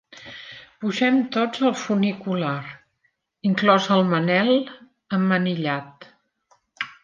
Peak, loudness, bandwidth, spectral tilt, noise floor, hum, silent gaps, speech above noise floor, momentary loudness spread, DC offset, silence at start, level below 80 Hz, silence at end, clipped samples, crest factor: -4 dBFS; -22 LUFS; 7.4 kHz; -6 dB/octave; -70 dBFS; none; none; 49 dB; 19 LU; under 0.1%; 0.15 s; -70 dBFS; 0.1 s; under 0.1%; 20 dB